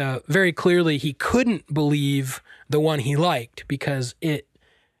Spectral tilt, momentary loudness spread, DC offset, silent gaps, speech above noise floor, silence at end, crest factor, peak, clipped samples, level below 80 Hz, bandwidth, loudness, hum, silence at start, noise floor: -6 dB/octave; 9 LU; under 0.1%; none; 40 dB; 0.6 s; 16 dB; -6 dBFS; under 0.1%; -52 dBFS; 14.5 kHz; -22 LUFS; none; 0 s; -62 dBFS